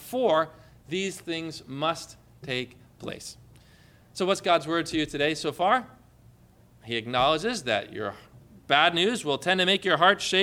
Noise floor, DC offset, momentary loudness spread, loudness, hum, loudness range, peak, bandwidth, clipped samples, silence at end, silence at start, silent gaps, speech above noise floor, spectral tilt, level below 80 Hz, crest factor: -56 dBFS; under 0.1%; 17 LU; -26 LUFS; 60 Hz at -60 dBFS; 9 LU; -6 dBFS; 17.5 kHz; under 0.1%; 0 s; 0 s; none; 30 dB; -3.5 dB/octave; -60 dBFS; 22 dB